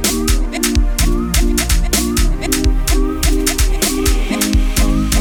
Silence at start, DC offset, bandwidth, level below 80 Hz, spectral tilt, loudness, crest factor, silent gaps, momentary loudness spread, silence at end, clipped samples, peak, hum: 0 s; under 0.1%; over 20 kHz; -16 dBFS; -4 dB/octave; -16 LUFS; 14 dB; none; 2 LU; 0 s; under 0.1%; 0 dBFS; none